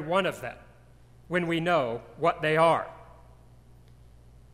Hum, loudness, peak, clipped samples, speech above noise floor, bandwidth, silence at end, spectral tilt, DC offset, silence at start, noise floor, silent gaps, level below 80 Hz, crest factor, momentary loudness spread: none; -27 LUFS; -10 dBFS; under 0.1%; 28 dB; 15 kHz; 1.5 s; -6 dB/octave; under 0.1%; 0 s; -54 dBFS; none; -58 dBFS; 20 dB; 17 LU